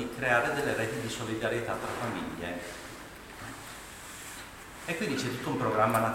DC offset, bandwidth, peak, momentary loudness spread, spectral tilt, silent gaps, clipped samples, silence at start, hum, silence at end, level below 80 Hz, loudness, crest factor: under 0.1%; 17 kHz; -10 dBFS; 17 LU; -4.5 dB/octave; none; under 0.1%; 0 s; none; 0 s; -56 dBFS; -32 LUFS; 22 dB